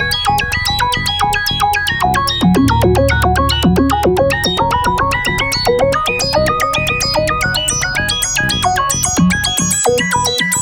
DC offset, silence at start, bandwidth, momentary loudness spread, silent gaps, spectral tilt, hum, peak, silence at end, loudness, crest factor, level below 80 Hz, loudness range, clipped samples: under 0.1%; 0 s; 19.5 kHz; 2 LU; none; -3.5 dB/octave; none; -2 dBFS; 0 s; -13 LUFS; 10 dB; -26 dBFS; 1 LU; under 0.1%